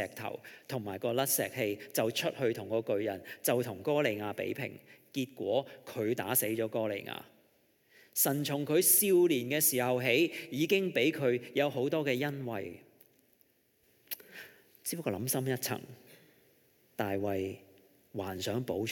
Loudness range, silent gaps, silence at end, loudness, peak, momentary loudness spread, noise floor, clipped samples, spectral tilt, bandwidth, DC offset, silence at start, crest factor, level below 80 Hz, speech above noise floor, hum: 10 LU; none; 0 s; -32 LUFS; -12 dBFS; 15 LU; -71 dBFS; under 0.1%; -4 dB/octave; 17.5 kHz; under 0.1%; 0 s; 20 dB; -84 dBFS; 38 dB; none